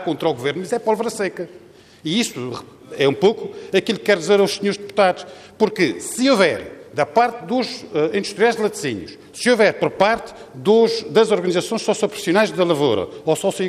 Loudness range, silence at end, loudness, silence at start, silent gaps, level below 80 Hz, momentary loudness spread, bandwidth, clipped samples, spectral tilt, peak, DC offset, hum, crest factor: 4 LU; 0 s; -19 LUFS; 0 s; none; -60 dBFS; 13 LU; 15 kHz; under 0.1%; -4.5 dB/octave; -2 dBFS; under 0.1%; none; 16 dB